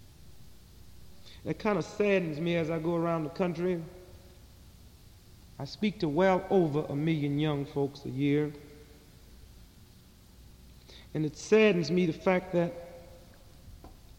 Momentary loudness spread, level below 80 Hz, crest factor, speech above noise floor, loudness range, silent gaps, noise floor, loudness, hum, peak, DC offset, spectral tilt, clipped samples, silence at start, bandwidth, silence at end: 18 LU; -56 dBFS; 20 dB; 27 dB; 6 LU; none; -56 dBFS; -29 LUFS; none; -12 dBFS; under 0.1%; -7 dB/octave; under 0.1%; 0 s; 16.5 kHz; 0.25 s